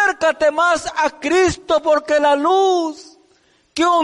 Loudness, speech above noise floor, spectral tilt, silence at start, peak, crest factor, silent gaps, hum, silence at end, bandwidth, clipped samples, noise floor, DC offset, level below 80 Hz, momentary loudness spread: -16 LUFS; 41 dB; -3.5 dB/octave; 0 s; -6 dBFS; 10 dB; none; none; 0 s; 11.5 kHz; under 0.1%; -57 dBFS; under 0.1%; -48 dBFS; 6 LU